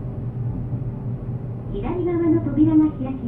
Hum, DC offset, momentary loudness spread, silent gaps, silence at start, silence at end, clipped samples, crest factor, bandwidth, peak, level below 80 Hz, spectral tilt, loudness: none; under 0.1%; 12 LU; none; 0 s; 0 s; under 0.1%; 16 dB; 3.6 kHz; -6 dBFS; -38 dBFS; -12.5 dB/octave; -22 LUFS